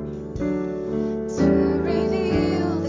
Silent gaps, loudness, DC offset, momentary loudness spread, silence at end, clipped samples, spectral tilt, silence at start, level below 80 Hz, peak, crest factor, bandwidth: none; -23 LUFS; under 0.1%; 7 LU; 0 s; under 0.1%; -7.5 dB/octave; 0 s; -38 dBFS; -8 dBFS; 14 dB; 7.6 kHz